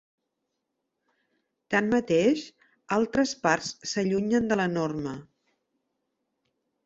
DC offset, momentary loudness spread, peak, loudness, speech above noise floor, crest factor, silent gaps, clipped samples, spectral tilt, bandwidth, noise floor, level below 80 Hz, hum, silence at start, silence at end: under 0.1%; 9 LU; -6 dBFS; -26 LUFS; 56 dB; 22 dB; none; under 0.1%; -5 dB/octave; 8 kHz; -81 dBFS; -62 dBFS; none; 1.7 s; 1.65 s